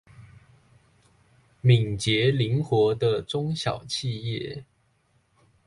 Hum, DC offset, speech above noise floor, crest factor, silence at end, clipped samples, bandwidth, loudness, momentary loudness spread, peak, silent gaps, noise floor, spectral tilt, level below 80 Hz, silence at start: none; under 0.1%; 43 dB; 20 dB; 1.05 s; under 0.1%; 11.5 kHz; -25 LUFS; 10 LU; -6 dBFS; none; -67 dBFS; -6 dB/octave; -56 dBFS; 0.2 s